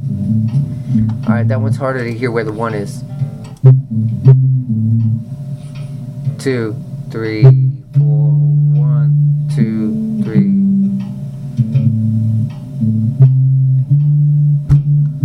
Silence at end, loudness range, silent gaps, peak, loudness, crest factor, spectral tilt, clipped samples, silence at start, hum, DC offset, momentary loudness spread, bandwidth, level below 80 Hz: 0 s; 3 LU; none; 0 dBFS; -14 LUFS; 12 dB; -9.5 dB/octave; 0.3%; 0 s; none; under 0.1%; 12 LU; 5.8 kHz; -40 dBFS